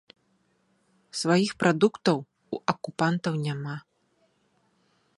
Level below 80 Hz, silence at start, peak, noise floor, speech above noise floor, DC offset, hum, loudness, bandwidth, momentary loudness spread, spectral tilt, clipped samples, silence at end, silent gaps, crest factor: -70 dBFS; 1.15 s; -6 dBFS; -69 dBFS; 44 dB; under 0.1%; none; -27 LUFS; 11.5 kHz; 14 LU; -5.5 dB/octave; under 0.1%; 1.4 s; none; 22 dB